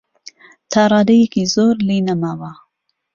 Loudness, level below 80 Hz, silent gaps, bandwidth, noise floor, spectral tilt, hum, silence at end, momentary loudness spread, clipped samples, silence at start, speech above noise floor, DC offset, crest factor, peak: -15 LUFS; -54 dBFS; none; 7.4 kHz; -70 dBFS; -5.5 dB/octave; none; 0.6 s; 12 LU; under 0.1%; 0.7 s; 55 dB; under 0.1%; 16 dB; 0 dBFS